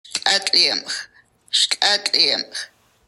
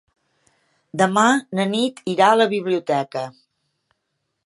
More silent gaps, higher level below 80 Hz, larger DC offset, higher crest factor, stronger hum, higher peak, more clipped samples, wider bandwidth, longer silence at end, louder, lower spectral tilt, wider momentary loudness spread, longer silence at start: neither; about the same, -70 dBFS vs -74 dBFS; neither; about the same, 20 dB vs 20 dB; neither; about the same, -2 dBFS vs -2 dBFS; neither; first, 14.5 kHz vs 11.5 kHz; second, 0.4 s vs 1.15 s; first, -16 LUFS vs -19 LUFS; second, 1 dB/octave vs -4.5 dB/octave; about the same, 14 LU vs 14 LU; second, 0.1 s vs 0.95 s